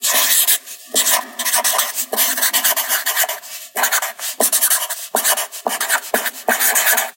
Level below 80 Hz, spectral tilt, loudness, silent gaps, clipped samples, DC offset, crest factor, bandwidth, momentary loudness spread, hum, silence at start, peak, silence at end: -72 dBFS; 2.5 dB/octave; -15 LUFS; none; under 0.1%; under 0.1%; 18 dB; 17 kHz; 8 LU; none; 0 s; 0 dBFS; 0.05 s